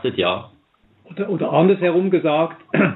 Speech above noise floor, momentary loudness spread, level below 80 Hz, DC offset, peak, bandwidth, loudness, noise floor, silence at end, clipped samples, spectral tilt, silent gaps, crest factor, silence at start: 40 dB; 12 LU; -66 dBFS; under 0.1%; -2 dBFS; 4.1 kHz; -19 LUFS; -58 dBFS; 0 s; under 0.1%; -10.5 dB/octave; none; 16 dB; 0.05 s